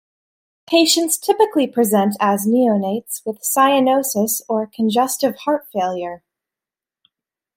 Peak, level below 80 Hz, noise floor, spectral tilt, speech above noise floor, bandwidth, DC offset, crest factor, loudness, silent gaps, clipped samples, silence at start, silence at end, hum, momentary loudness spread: -2 dBFS; -68 dBFS; -89 dBFS; -3.5 dB/octave; 72 dB; 16.5 kHz; under 0.1%; 16 dB; -17 LUFS; none; under 0.1%; 0.7 s; 1.4 s; none; 9 LU